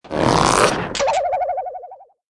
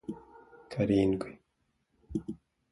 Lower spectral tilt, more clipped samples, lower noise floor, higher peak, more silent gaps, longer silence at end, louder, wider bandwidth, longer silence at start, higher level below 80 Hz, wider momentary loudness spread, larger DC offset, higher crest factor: second, -4 dB/octave vs -8 dB/octave; neither; second, -40 dBFS vs -77 dBFS; first, -2 dBFS vs -14 dBFS; neither; about the same, 0.25 s vs 0.35 s; first, -18 LUFS vs -31 LUFS; about the same, 12 kHz vs 11.5 kHz; about the same, 0.05 s vs 0.1 s; first, -40 dBFS vs -56 dBFS; second, 14 LU vs 19 LU; neither; about the same, 18 dB vs 20 dB